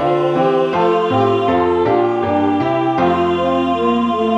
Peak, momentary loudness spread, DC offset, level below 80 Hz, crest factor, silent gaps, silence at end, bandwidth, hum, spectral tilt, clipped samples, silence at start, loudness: -4 dBFS; 2 LU; under 0.1%; -48 dBFS; 12 dB; none; 0 s; 7.8 kHz; none; -7.5 dB/octave; under 0.1%; 0 s; -15 LUFS